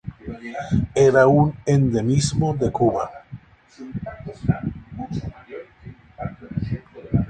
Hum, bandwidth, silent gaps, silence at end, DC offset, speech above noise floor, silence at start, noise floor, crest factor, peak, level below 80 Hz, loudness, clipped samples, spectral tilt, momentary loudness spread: none; 9.6 kHz; none; 0 s; under 0.1%; 25 dB; 0.05 s; -43 dBFS; 20 dB; -2 dBFS; -42 dBFS; -21 LUFS; under 0.1%; -7 dB/octave; 22 LU